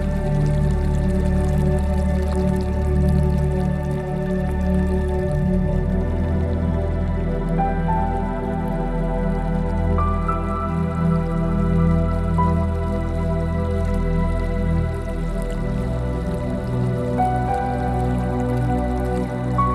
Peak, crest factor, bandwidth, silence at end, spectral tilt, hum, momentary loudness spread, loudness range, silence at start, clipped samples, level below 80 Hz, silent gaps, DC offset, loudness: -6 dBFS; 14 dB; 12 kHz; 0 s; -9 dB/octave; none; 4 LU; 3 LU; 0 s; under 0.1%; -26 dBFS; none; under 0.1%; -22 LUFS